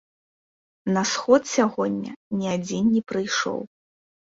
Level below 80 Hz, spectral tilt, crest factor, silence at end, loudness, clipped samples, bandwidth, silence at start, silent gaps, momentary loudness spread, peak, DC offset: -64 dBFS; -4.5 dB/octave; 20 dB; 0.7 s; -24 LUFS; under 0.1%; 7.8 kHz; 0.85 s; 2.16-2.31 s; 12 LU; -4 dBFS; under 0.1%